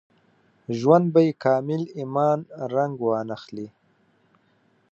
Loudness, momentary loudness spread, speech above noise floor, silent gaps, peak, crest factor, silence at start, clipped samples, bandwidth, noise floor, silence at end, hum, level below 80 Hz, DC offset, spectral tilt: -23 LUFS; 18 LU; 42 dB; none; -2 dBFS; 22 dB; 0.7 s; under 0.1%; 7.4 kHz; -64 dBFS; 1.25 s; none; -72 dBFS; under 0.1%; -8.5 dB/octave